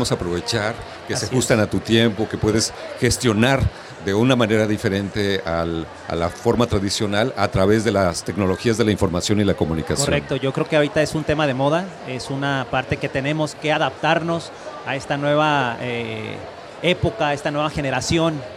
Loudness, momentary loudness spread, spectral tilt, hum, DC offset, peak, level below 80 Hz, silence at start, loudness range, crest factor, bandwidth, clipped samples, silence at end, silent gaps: -20 LUFS; 9 LU; -5 dB/octave; none; under 0.1%; -2 dBFS; -40 dBFS; 0 s; 3 LU; 18 dB; 16 kHz; under 0.1%; 0 s; none